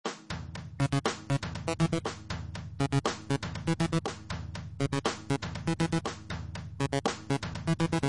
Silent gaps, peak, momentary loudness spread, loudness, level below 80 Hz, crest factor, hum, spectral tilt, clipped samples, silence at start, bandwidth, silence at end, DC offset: none; -12 dBFS; 10 LU; -33 LUFS; -52 dBFS; 20 dB; none; -5.5 dB/octave; under 0.1%; 0.05 s; 11.5 kHz; 0 s; 0.1%